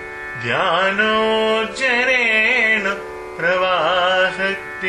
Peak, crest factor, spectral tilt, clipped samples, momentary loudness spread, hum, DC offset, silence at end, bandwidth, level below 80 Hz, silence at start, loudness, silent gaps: -4 dBFS; 14 dB; -3.5 dB/octave; under 0.1%; 9 LU; none; under 0.1%; 0 s; 12 kHz; -52 dBFS; 0 s; -16 LUFS; none